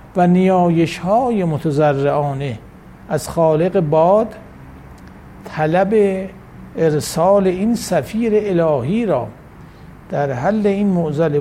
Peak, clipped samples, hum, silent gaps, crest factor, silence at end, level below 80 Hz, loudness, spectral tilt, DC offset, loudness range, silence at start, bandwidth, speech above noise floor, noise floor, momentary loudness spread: -2 dBFS; under 0.1%; none; none; 14 dB; 0 s; -44 dBFS; -17 LUFS; -7 dB/octave; under 0.1%; 2 LU; 0.05 s; 15.5 kHz; 23 dB; -39 dBFS; 12 LU